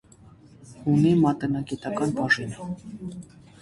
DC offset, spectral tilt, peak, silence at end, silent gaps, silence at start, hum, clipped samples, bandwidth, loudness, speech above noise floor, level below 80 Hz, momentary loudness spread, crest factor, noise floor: under 0.1%; -7 dB/octave; -8 dBFS; 0.35 s; none; 0.6 s; none; under 0.1%; 11.5 kHz; -24 LUFS; 27 dB; -56 dBFS; 18 LU; 16 dB; -51 dBFS